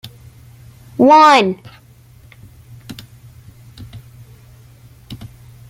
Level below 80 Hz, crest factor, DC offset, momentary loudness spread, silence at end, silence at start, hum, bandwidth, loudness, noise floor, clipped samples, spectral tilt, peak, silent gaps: -50 dBFS; 18 dB; under 0.1%; 29 LU; 0.55 s; 0.05 s; none; 16 kHz; -10 LUFS; -45 dBFS; under 0.1%; -5 dB/octave; -2 dBFS; none